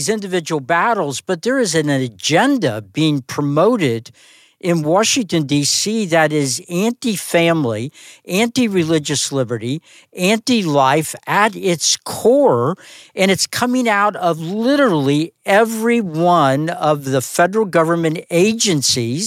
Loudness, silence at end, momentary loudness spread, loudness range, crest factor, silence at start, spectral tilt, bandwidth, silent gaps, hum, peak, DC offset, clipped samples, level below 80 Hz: -16 LUFS; 0 s; 7 LU; 2 LU; 16 dB; 0 s; -4 dB/octave; 17 kHz; none; none; -2 dBFS; under 0.1%; under 0.1%; -62 dBFS